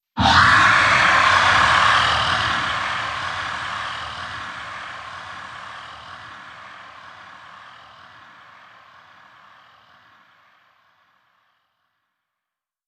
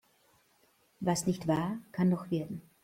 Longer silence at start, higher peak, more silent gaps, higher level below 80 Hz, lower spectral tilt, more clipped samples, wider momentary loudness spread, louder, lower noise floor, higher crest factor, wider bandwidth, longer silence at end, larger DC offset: second, 0.15 s vs 1 s; first, -2 dBFS vs -16 dBFS; neither; first, -46 dBFS vs -66 dBFS; second, -2.5 dB/octave vs -6 dB/octave; neither; first, 25 LU vs 6 LU; first, -17 LUFS vs -33 LUFS; first, -86 dBFS vs -69 dBFS; about the same, 20 dB vs 18 dB; second, 11 kHz vs 16 kHz; first, 5.15 s vs 0.25 s; neither